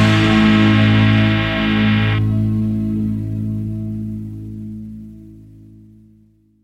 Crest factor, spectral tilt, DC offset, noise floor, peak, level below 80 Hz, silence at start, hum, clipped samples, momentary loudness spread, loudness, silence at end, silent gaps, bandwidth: 16 dB; -7 dB/octave; under 0.1%; -52 dBFS; -2 dBFS; -34 dBFS; 0 s; none; under 0.1%; 18 LU; -16 LUFS; 1.2 s; none; 8.2 kHz